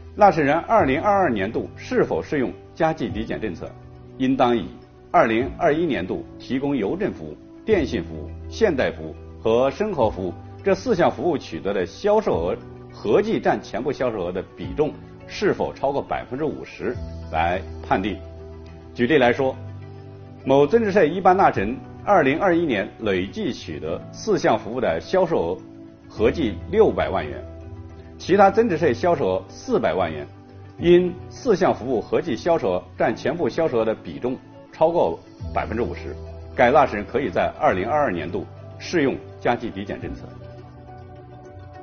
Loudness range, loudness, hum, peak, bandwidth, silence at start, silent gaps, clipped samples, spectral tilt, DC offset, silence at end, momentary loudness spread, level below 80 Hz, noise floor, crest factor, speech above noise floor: 5 LU; -22 LUFS; none; -2 dBFS; 6.8 kHz; 0 s; none; under 0.1%; -5 dB/octave; under 0.1%; 0 s; 19 LU; -44 dBFS; -41 dBFS; 20 dB; 20 dB